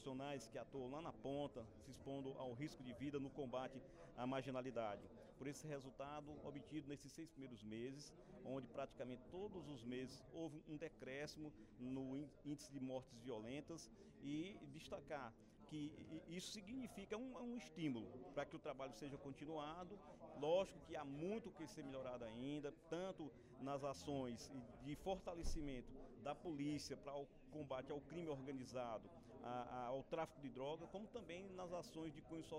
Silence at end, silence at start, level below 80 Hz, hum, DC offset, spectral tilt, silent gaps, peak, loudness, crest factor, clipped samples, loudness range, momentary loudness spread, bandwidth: 0 s; 0 s; -66 dBFS; none; under 0.1%; -5.5 dB/octave; none; -30 dBFS; -52 LUFS; 20 dB; under 0.1%; 5 LU; 8 LU; 15.5 kHz